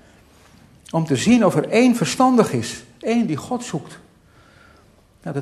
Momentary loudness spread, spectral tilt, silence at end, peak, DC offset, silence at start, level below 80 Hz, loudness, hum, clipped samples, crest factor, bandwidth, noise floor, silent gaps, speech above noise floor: 14 LU; -5.5 dB/octave; 0 s; 0 dBFS; under 0.1%; 0.9 s; -56 dBFS; -19 LUFS; none; under 0.1%; 20 dB; 13.5 kHz; -53 dBFS; none; 35 dB